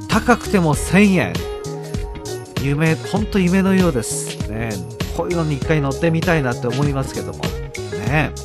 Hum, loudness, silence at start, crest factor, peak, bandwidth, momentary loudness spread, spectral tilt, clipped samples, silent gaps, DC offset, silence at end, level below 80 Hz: none; -19 LUFS; 0 s; 18 dB; 0 dBFS; 14 kHz; 12 LU; -5.5 dB/octave; under 0.1%; none; under 0.1%; 0 s; -32 dBFS